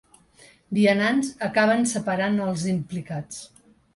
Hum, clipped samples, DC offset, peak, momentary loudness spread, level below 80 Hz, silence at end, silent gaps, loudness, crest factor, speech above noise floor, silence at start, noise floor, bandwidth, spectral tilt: none; under 0.1%; under 0.1%; -6 dBFS; 14 LU; -62 dBFS; 0.5 s; none; -23 LUFS; 18 dB; 31 dB; 0.7 s; -54 dBFS; 11.5 kHz; -5 dB/octave